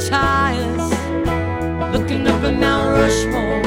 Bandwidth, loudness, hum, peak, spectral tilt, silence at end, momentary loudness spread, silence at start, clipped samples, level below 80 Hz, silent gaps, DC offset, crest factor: 16.5 kHz; -18 LUFS; none; -2 dBFS; -5.5 dB/octave; 0 s; 5 LU; 0 s; under 0.1%; -28 dBFS; none; under 0.1%; 16 dB